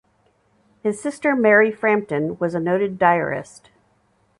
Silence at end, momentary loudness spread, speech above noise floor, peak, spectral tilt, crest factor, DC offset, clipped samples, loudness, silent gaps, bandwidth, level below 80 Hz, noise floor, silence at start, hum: 0.95 s; 12 LU; 43 dB; -2 dBFS; -6.5 dB/octave; 18 dB; under 0.1%; under 0.1%; -19 LUFS; none; 11.5 kHz; -62 dBFS; -63 dBFS; 0.85 s; none